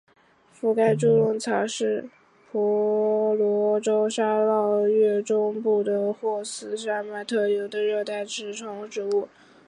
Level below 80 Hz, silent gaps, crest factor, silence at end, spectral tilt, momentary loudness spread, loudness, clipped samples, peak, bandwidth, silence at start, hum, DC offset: -78 dBFS; none; 14 dB; 0.4 s; -5 dB/octave; 11 LU; -24 LUFS; under 0.1%; -10 dBFS; 10.5 kHz; 0.65 s; none; under 0.1%